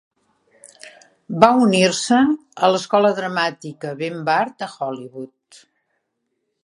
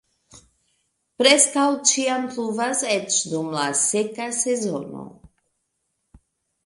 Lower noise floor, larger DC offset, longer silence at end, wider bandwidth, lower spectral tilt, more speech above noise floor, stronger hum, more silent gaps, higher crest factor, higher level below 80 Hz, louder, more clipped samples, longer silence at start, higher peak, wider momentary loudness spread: about the same, -74 dBFS vs -75 dBFS; neither; second, 1.4 s vs 1.55 s; about the same, 11.5 kHz vs 12 kHz; first, -4.5 dB/octave vs -1.5 dB/octave; about the same, 56 dB vs 54 dB; neither; neither; about the same, 20 dB vs 24 dB; about the same, -64 dBFS vs -64 dBFS; about the same, -18 LUFS vs -20 LUFS; neither; first, 0.85 s vs 0.35 s; about the same, 0 dBFS vs 0 dBFS; first, 17 LU vs 11 LU